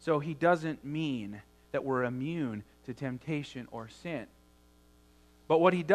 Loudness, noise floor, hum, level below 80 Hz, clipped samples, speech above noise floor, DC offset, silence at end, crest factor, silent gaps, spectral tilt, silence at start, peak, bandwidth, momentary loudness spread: -33 LUFS; -62 dBFS; none; -64 dBFS; under 0.1%; 31 dB; under 0.1%; 0 s; 24 dB; none; -7 dB/octave; 0 s; -10 dBFS; 13.5 kHz; 17 LU